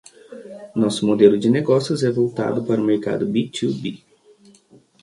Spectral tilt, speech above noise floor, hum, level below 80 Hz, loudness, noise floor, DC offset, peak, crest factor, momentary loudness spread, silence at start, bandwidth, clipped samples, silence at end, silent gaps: -6.5 dB/octave; 34 dB; none; -62 dBFS; -19 LUFS; -52 dBFS; under 0.1%; 0 dBFS; 20 dB; 15 LU; 0.3 s; 11.5 kHz; under 0.1%; 1.05 s; none